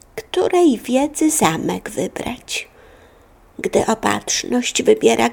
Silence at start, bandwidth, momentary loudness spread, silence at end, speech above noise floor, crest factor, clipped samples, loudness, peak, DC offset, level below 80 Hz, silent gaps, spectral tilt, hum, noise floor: 0.15 s; 18.5 kHz; 11 LU; 0 s; 31 dB; 18 dB; under 0.1%; -18 LUFS; -2 dBFS; under 0.1%; -48 dBFS; none; -3.5 dB/octave; none; -49 dBFS